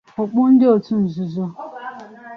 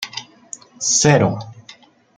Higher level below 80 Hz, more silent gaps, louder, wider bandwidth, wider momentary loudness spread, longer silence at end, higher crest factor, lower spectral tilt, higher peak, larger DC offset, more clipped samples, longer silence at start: second, -62 dBFS vs -56 dBFS; neither; about the same, -17 LUFS vs -15 LUFS; second, 5.8 kHz vs 10 kHz; second, 20 LU vs 23 LU; second, 0 s vs 0.45 s; about the same, 14 dB vs 18 dB; first, -10 dB/octave vs -3.5 dB/octave; about the same, -4 dBFS vs -2 dBFS; neither; neither; first, 0.2 s vs 0 s